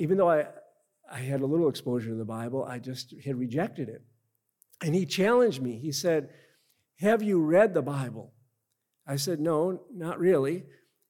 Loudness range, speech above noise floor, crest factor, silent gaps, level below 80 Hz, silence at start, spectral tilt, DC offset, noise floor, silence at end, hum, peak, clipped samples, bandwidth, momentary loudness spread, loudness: 6 LU; 52 dB; 20 dB; none; -76 dBFS; 0 s; -6 dB/octave; under 0.1%; -80 dBFS; 0.45 s; none; -8 dBFS; under 0.1%; 18 kHz; 15 LU; -28 LUFS